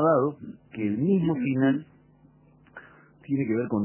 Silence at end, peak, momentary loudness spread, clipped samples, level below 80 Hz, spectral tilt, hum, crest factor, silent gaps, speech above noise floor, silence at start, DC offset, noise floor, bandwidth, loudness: 0 s; -10 dBFS; 18 LU; under 0.1%; -64 dBFS; -12 dB/octave; none; 16 dB; none; 32 dB; 0 s; under 0.1%; -57 dBFS; 3.2 kHz; -26 LUFS